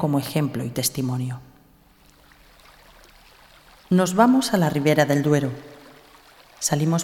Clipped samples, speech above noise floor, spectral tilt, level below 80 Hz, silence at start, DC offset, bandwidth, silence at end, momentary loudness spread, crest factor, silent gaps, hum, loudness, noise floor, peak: under 0.1%; 34 dB; -5.5 dB/octave; -58 dBFS; 0 s; under 0.1%; 18 kHz; 0 s; 12 LU; 22 dB; none; none; -21 LUFS; -55 dBFS; -2 dBFS